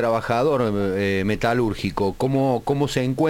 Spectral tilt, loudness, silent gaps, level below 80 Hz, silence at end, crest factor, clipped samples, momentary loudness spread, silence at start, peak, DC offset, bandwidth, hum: -6.5 dB/octave; -22 LUFS; none; -42 dBFS; 0 s; 14 dB; under 0.1%; 3 LU; 0 s; -6 dBFS; under 0.1%; 17 kHz; none